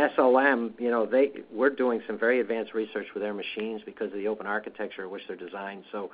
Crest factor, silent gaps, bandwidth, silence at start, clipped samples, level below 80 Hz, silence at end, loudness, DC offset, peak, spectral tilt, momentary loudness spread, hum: 20 dB; none; 5 kHz; 0 s; under 0.1%; -74 dBFS; 0.05 s; -28 LUFS; under 0.1%; -8 dBFS; -2.5 dB/octave; 15 LU; none